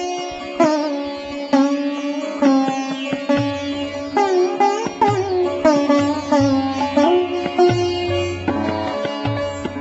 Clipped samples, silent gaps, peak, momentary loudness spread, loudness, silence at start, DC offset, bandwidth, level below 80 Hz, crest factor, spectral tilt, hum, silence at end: under 0.1%; none; -2 dBFS; 8 LU; -19 LUFS; 0 s; under 0.1%; 8 kHz; -52 dBFS; 16 dB; -4.5 dB/octave; none; 0 s